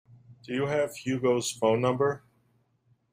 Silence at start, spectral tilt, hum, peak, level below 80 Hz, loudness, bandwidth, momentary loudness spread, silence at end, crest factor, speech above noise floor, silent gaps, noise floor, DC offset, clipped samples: 0.3 s; -5 dB/octave; none; -12 dBFS; -68 dBFS; -28 LUFS; 15.5 kHz; 7 LU; 0.95 s; 18 dB; 42 dB; none; -69 dBFS; under 0.1%; under 0.1%